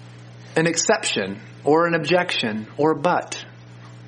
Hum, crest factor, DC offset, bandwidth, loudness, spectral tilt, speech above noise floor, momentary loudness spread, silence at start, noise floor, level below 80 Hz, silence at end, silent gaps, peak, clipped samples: none; 20 dB; under 0.1%; 10 kHz; -21 LUFS; -3.5 dB/octave; 21 dB; 11 LU; 0 s; -42 dBFS; -66 dBFS; 0 s; none; -2 dBFS; under 0.1%